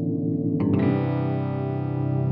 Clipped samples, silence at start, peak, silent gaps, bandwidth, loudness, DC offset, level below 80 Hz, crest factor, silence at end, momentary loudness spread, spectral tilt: under 0.1%; 0 s; -10 dBFS; none; 4.7 kHz; -24 LUFS; under 0.1%; -62 dBFS; 12 dB; 0 s; 5 LU; -12.5 dB/octave